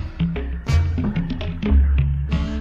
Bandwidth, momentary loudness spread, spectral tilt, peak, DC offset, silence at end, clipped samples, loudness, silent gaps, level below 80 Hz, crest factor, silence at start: 7.4 kHz; 7 LU; -8 dB/octave; -6 dBFS; under 0.1%; 0 s; under 0.1%; -22 LUFS; none; -22 dBFS; 14 dB; 0 s